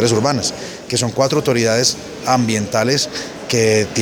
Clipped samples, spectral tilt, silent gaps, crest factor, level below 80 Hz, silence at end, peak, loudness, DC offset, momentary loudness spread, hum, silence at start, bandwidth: under 0.1%; -4 dB/octave; none; 16 dB; -50 dBFS; 0 s; 0 dBFS; -17 LUFS; under 0.1%; 7 LU; none; 0 s; 19.5 kHz